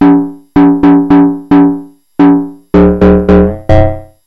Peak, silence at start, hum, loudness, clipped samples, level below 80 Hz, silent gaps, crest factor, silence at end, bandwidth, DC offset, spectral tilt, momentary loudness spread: 0 dBFS; 0 s; none; -8 LUFS; under 0.1%; -20 dBFS; none; 8 dB; 0.25 s; 4.9 kHz; 0.6%; -10 dB/octave; 7 LU